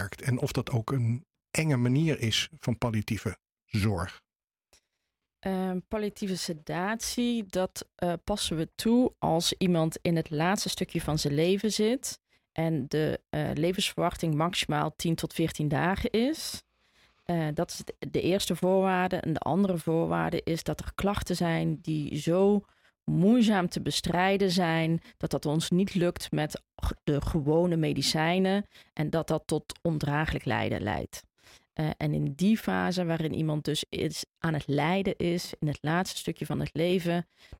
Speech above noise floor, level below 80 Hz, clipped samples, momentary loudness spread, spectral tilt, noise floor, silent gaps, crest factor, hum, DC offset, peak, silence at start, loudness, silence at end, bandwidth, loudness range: 56 dB; -50 dBFS; under 0.1%; 8 LU; -5.5 dB/octave; -84 dBFS; none; 16 dB; none; under 0.1%; -12 dBFS; 0 s; -29 LUFS; 0.05 s; 16.5 kHz; 5 LU